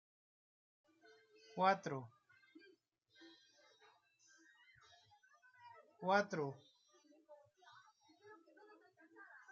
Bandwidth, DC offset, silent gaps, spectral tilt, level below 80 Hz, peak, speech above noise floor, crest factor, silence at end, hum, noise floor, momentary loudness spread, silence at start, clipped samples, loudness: 7.2 kHz; under 0.1%; none; -3.5 dB/octave; under -90 dBFS; -20 dBFS; 36 dB; 28 dB; 0.15 s; none; -74 dBFS; 29 LU; 1.55 s; under 0.1%; -40 LUFS